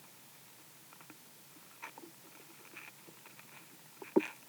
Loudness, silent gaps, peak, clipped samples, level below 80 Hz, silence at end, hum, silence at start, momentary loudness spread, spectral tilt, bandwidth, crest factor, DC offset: -45 LUFS; none; -14 dBFS; under 0.1%; under -90 dBFS; 0 s; none; 0 s; 20 LU; -4.5 dB/octave; over 20 kHz; 30 dB; under 0.1%